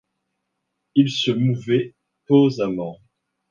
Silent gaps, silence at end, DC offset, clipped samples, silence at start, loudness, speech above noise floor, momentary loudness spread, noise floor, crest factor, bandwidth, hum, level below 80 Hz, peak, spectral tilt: none; 0.55 s; under 0.1%; under 0.1%; 0.95 s; -20 LUFS; 58 dB; 12 LU; -77 dBFS; 18 dB; 7.4 kHz; none; -64 dBFS; -4 dBFS; -7 dB/octave